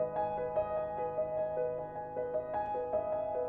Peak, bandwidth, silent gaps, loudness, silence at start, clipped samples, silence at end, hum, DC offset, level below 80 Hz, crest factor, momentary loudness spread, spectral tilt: -22 dBFS; 4.1 kHz; none; -36 LUFS; 0 s; under 0.1%; 0 s; none; under 0.1%; -62 dBFS; 12 dB; 3 LU; -9.5 dB/octave